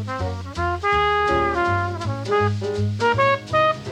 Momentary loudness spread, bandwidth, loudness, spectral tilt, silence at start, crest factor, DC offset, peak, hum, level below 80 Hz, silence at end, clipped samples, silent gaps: 8 LU; 10 kHz; -21 LUFS; -6 dB/octave; 0 s; 12 dB; under 0.1%; -8 dBFS; none; -40 dBFS; 0 s; under 0.1%; none